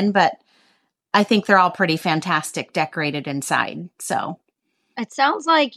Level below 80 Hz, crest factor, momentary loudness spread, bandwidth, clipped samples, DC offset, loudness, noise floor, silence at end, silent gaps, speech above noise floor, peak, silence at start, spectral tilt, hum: -74 dBFS; 20 dB; 15 LU; 14.5 kHz; under 0.1%; under 0.1%; -20 LUFS; -71 dBFS; 0 s; none; 51 dB; -2 dBFS; 0 s; -4 dB/octave; none